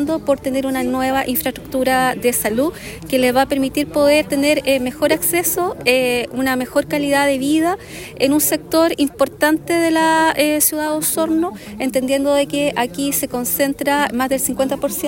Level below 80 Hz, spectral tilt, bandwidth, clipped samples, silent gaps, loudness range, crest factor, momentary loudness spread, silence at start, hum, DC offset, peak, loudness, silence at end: -46 dBFS; -3 dB/octave; 17 kHz; under 0.1%; none; 2 LU; 16 dB; 6 LU; 0 s; none; under 0.1%; 0 dBFS; -17 LUFS; 0 s